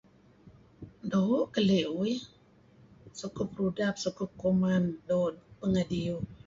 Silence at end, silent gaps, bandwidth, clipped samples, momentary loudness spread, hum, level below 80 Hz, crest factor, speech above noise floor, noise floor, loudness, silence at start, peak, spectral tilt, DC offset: 0.1 s; none; 7.6 kHz; under 0.1%; 15 LU; none; -58 dBFS; 16 dB; 30 dB; -60 dBFS; -30 LUFS; 0.45 s; -16 dBFS; -6.5 dB/octave; under 0.1%